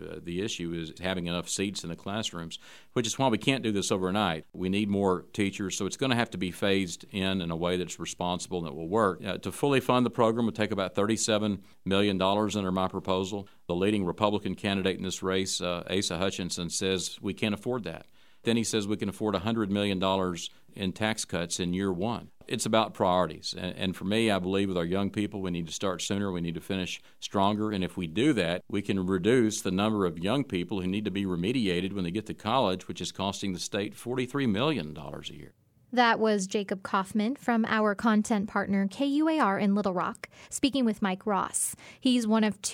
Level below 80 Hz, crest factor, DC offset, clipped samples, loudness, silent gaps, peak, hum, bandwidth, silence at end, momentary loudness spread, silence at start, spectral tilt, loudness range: -60 dBFS; 24 dB; 0.2%; under 0.1%; -29 LUFS; none; -6 dBFS; none; 16 kHz; 0 s; 9 LU; 0 s; -4.5 dB/octave; 3 LU